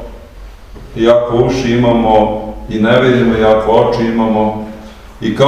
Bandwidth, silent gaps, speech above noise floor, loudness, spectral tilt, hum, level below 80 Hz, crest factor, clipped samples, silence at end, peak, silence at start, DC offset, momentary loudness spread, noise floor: 9.6 kHz; none; 22 dB; -12 LUFS; -7 dB/octave; none; -32 dBFS; 12 dB; 0.2%; 0 s; 0 dBFS; 0 s; 0.4%; 14 LU; -32 dBFS